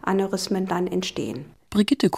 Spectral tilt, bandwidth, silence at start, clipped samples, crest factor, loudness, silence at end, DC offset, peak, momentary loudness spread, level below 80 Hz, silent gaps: -5.5 dB/octave; 15.5 kHz; 0.05 s; under 0.1%; 16 dB; -25 LUFS; 0 s; under 0.1%; -8 dBFS; 10 LU; -56 dBFS; none